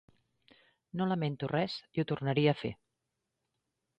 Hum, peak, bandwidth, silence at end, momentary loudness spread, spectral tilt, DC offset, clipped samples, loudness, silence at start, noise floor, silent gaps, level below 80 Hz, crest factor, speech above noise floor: none; -16 dBFS; 8.4 kHz; 1.25 s; 12 LU; -8 dB/octave; under 0.1%; under 0.1%; -33 LUFS; 0.95 s; -85 dBFS; none; -68 dBFS; 20 dB; 53 dB